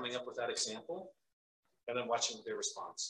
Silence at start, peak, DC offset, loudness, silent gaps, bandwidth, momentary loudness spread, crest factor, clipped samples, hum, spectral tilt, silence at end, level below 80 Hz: 0 s; -22 dBFS; under 0.1%; -39 LUFS; 1.33-1.63 s, 1.83-1.87 s; 11.5 kHz; 12 LU; 20 dB; under 0.1%; none; -1 dB/octave; 0 s; -86 dBFS